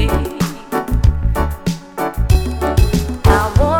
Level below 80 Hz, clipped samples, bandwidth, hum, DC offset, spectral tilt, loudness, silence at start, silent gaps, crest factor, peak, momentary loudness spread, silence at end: -18 dBFS; under 0.1%; 17.5 kHz; none; under 0.1%; -6.5 dB/octave; -17 LUFS; 0 s; none; 14 dB; 0 dBFS; 9 LU; 0 s